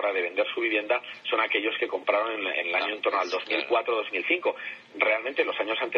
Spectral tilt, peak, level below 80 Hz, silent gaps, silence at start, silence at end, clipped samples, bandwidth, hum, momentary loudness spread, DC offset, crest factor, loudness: -3 dB/octave; -8 dBFS; -82 dBFS; none; 0 s; 0 s; under 0.1%; 6.8 kHz; none; 4 LU; under 0.1%; 20 dB; -26 LUFS